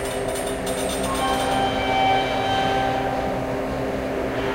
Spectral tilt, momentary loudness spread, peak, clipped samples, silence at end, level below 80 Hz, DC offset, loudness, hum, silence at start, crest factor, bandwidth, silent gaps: -4 dB/octave; 6 LU; -8 dBFS; under 0.1%; 0 s; -40 dBFS; under 0.1%; -23 LUFS; none; 0 s; 14 dB; 16 kHz; none